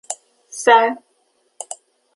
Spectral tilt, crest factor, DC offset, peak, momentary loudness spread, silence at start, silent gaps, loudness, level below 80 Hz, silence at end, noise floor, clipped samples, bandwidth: -0.5 dB/octave; 20 dB; under 0.1%; -2 dBFS; 22 LU; 0.1 s; none; -15 LUFS; -72 dBFS; 0.4 s; -64 dBFS; under 0.1%; 11.5 kHz